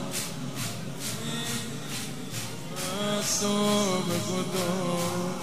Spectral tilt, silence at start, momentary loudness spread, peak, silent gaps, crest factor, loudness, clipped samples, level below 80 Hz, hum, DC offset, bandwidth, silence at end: -3.5 dB/octave; 0 s; 10 LU; -14 dBFS; none; 16 dB; -29 LUFS; under 0.1%; -60 dBFS; none; 0.9%; 16 kHz; 0 s